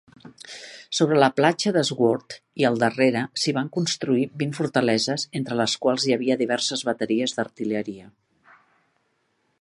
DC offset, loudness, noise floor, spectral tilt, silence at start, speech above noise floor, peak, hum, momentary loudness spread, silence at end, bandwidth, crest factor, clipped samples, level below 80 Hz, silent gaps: under 0.1%; -23 LUFS; -70 dBFS; -4.5 dB/octave; 0.25 s; 47 dB; -4 dBFS; none; 11 LU; 1.55 s; 11.5 kHz; 20 dB; under 0.1%; -70 dBFS; none